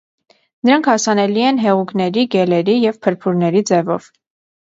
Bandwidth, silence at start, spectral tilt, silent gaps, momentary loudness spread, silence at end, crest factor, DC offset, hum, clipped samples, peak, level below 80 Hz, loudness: 7.8 kHz; 0.65 s; -5 dB/octave; none; 5 LU; 0.75 s; 16 dB; under 0.1%; none; under 0.1%; 0 dBFS; -64 dBFS; -15 LUFS